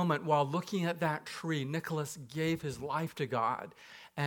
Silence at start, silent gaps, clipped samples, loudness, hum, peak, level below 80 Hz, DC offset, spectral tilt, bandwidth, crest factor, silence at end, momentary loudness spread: 0 s; none; under 0.1%; -34 LUFS; none; -16 dBFS; -68 dBFS; under 0.1%; -6 dB/octave; 18.5 kHz; 20 dB; 0 s; 10 LU